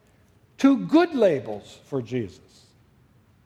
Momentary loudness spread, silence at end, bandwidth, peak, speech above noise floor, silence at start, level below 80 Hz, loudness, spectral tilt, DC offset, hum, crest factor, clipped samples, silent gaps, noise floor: 18 LU; 1.2 s; 9 kHz; -6 dBFS; 36 dB; 0.6 s; -66 dBFS; -23 LUFS; -7 dB/octave; under 0.1%; none; 18 dB; under 0.1%; none; -58 dBFS